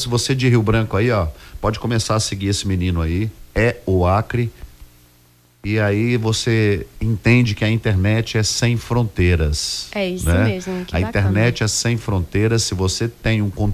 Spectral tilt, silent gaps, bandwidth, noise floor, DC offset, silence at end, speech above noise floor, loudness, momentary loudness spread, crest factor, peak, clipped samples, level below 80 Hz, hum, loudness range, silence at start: -5 dB/octave; none; 15.5 kHz; -53 dBFS; under 0.1%; 0 s; 35 dB; -19 LUFS; 7 LU; 14 dB; -4 dBFS; under 0.1%; -30 dBFS; none; 3 LU; 0 s